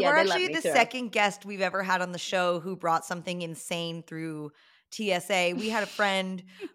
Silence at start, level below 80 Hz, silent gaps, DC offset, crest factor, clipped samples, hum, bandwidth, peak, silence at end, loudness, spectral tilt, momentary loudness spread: 0 s; -80 dBFS; none; under 0.1%; 20 dB; under 0.1%; none; 16.5 kHz; -8 dBFS; 0.05 s; -28 LUFS; -3.5 dB/octave; 13 LU